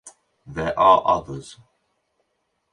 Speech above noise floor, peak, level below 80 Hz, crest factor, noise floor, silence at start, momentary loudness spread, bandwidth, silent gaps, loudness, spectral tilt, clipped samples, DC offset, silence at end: 54 dB; -4 dBFS; -52 dBFS; 20 dB; -73 dBFS; 0.05 s; 20 LU; 11 kHz; none; -19 LUFS; -5 dB/octave; under 0.1%; under 0.1%; 1.2 s